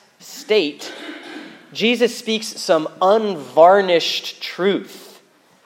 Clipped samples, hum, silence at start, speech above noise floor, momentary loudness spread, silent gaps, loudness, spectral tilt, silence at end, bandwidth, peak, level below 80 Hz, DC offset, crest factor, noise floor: under 0.1%; none; 0.25 s; 35 dB; 22 LU; none; -17 LUFS; -3.5 dB/octave; 0.6 s; 16.5 kHz; 0 dBFS; -82 dBFS; under 0.1%; 18 dB; -52 dBFS